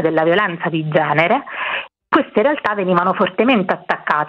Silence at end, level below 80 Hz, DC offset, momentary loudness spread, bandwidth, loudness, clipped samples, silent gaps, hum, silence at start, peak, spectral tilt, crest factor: 0 s; -60 dBFS; under 0.1%; 7 LU; 6.6 kHz; -17 LUFS; under 0.1%; none; none; 0 s; 0 dBFS; -8 dB/octave; 16 dB